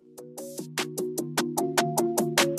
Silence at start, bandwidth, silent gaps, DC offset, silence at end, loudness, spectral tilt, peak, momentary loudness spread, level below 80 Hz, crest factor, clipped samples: 0.1 s; 15.5 kHz; none; under 0.1%; 0 s; -27 LUFS; -3.5 dB/octave; -8 dBFS; 14 LU; -68 dBFS; 20 dB; under 0.1%